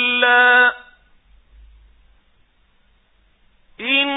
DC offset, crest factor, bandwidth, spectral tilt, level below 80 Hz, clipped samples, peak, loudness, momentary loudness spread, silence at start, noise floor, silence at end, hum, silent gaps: under 0.1%; 18 dB; 4 kHz; -6 dB/octave; -54 dBFS; under 0.1%; -2 dBFS; -14 LUFS; 17 LU; 0 s; -58 dBFS; 0 s; none; none